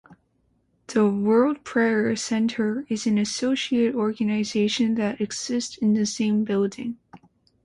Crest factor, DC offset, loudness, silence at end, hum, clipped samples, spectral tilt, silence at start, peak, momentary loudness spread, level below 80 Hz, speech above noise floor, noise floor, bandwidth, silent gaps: 14 dB; under 0.1%; -23 LUFS; 0.5 s; none; under 0.1%; -5 dB/octave; 0.1 s; -10 dBFS; 7 LU; -64 dBFS; 45 dB; -67 dBFS; 11 kHz; none